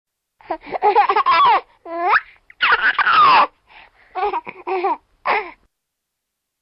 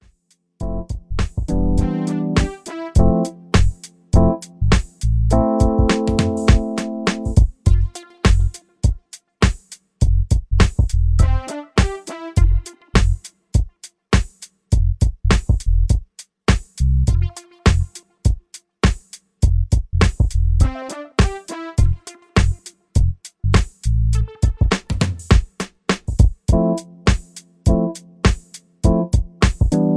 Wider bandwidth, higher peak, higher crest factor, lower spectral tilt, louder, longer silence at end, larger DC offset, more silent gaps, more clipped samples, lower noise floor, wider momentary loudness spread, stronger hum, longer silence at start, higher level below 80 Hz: second, 5.8 kHz vs 11 kHz; second, -4 dBFS vs 0 dBFS; about the same, 14 dB vs 18 dB; about the same, -5.5 dB/octave vs -6 dB/octave; first, -16 LUFS vs -20 LUFS; first, 1.1 s vs 0 s; neither; neither; neither; first, -78 dBFS vs -63 dBFS; first, 16 LU vs 9 LU; neither; about the same, 0.5 s vs 0.6 s; second, -58 dBFS vs -20 dBFS